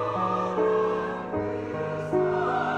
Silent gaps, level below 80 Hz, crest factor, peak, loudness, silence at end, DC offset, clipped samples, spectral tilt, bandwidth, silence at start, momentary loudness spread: none; -56 dBFS; 14 dB; -12 dBFS; -27 LUFS; 0 s; under 0.1%; under 0.1%; -7.5 dB/octave; 9 kHz; 0 s; 7 LU